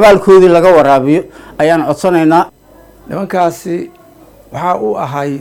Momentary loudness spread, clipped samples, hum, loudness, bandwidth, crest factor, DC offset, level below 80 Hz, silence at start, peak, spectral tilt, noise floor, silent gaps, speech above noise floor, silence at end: 16 LU; 0.5%; none; -10 LUFS; 16.5 kHz; 10 dB; under 0.1%; -42 dBFS; 0 s; 0 dBFS; -6.5 dB/octave; -41 dBFS; none; 31 dB; 0 s